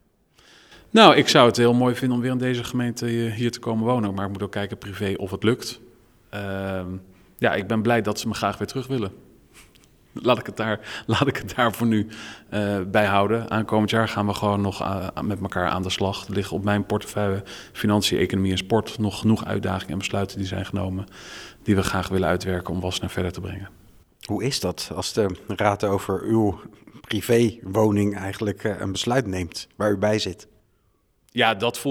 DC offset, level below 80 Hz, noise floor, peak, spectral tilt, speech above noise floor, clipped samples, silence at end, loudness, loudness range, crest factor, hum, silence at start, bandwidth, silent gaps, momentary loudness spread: under 0.1%; -52 dBFS; -65 dBFS; 0 dBFS; -5.5 dB/octave; 42 dB; under 0.1%; 0 s; -23 LUFS; 4 LU; 24 dB; none; 0.7 s; 18 kHz; none; 11 LU